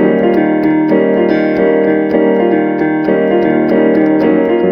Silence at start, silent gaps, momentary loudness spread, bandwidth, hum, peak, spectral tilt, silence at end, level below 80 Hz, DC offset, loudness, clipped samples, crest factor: 0 s; none; 2 LU; 5.4 kHz; none; 0 dBFS; -9.5 dB/octave; 0 s; -48 dBFS; under 0.1%; -11 LUFS; under 0.1%; 10 dB